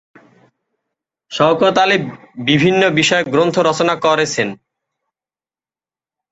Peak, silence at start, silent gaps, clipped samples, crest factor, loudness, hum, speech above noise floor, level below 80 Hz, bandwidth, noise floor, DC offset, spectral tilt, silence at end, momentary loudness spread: 0 dBFS; 1.3 s; none; under 0.1%; 16 dB; -14 LUFS; none; over 76 dB; -56 dBFS; 8.2 kHz; under -90 dBFS; under 0.1%; -4.5 dB/octave; 1.8 s; 9 LU